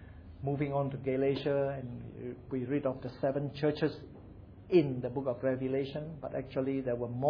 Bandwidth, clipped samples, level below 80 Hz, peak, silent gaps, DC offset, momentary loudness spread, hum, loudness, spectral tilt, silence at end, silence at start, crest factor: 5.4 kHz; under 0.1%; -58 dBFS; -14 dBFS; none; under 0.1%; 14 LU; none; -34 LUFS; -7 dB/octave; 0 s; 0 s; 20 dB